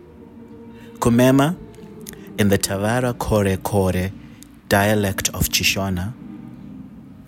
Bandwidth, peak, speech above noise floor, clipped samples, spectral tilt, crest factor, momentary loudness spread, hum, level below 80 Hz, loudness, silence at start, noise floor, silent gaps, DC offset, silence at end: 16.5 kHz; -4 dBFS; 24 dB; under 0.1%; -4.5 dB/octave; 18 dB; 23 LU; none; -40 dBFS; -19 LUFS; 0.2 s; -42 dBFS; none; under 0.1%; 0.05 s